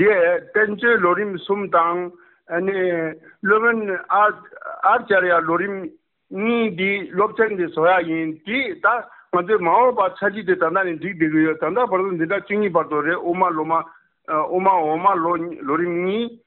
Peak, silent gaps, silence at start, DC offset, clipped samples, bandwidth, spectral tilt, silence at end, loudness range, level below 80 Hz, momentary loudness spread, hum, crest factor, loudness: -4 dBFS; none; 0 s; under 0.1%; under 0.1%; 4.3 kHz; -4 dB/octave; 0.1 s; 1 LU; -64 dBFS; 8 LU; none; 16 dB; -20 LUFS